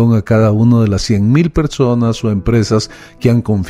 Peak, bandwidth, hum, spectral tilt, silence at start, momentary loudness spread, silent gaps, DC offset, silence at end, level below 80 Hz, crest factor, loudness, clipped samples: 0 dBFS; 11 kHz; none; -7 dB/octave; 0 s; 6 LU; none; under 0.1%; 0 s; -30 dBFS; 12 dB; -13 LUFS; under 0.1%